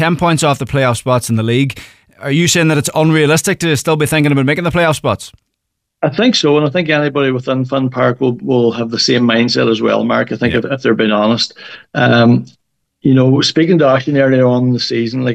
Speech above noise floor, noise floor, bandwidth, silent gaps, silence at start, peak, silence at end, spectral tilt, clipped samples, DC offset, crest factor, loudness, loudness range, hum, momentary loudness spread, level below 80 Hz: 61 dB; -73 dBFS; 15.5 kHz; none; 0 s; -2 dBFS; 0 s; -5 dB/octave; under 0.1%; under 0.1%; 12 dB; -13 LUFS; 2 LU; none; 7 LU; -46 dBFS